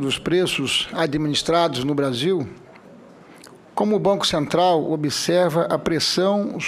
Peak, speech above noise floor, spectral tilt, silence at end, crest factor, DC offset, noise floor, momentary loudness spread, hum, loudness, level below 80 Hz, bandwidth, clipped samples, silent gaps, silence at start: -6 dBFS; 25 dB; -4.5 dB/octave; 0 s; 16 dB; under 0.1%; -45 dBFS; 4 LU; none; -20 LUFS; -54 dBFS; 15.5 kHz; under 0.1%; none; 0 s